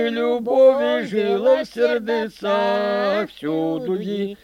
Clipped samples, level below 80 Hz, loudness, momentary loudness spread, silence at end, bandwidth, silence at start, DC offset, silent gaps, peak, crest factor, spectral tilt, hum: under 0.1%; -62 dBFS; -20 LUFS; 9 LU; 0.1 s; 11 kHz; 0 s; under 0.1%; none; -4 dBFS; 16 dB; -6 dB/octave; none